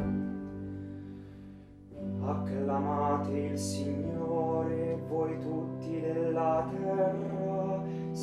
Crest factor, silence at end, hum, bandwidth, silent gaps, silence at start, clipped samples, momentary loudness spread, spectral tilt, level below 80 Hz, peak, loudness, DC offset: 14 dB; 0 s; none; 13.5 kHz; none; 0 s; under 0.1%; 14 LU; -7.5 dB/octave; -58 dBFS; -18 dBFS; -33 LUFS; under 0.1%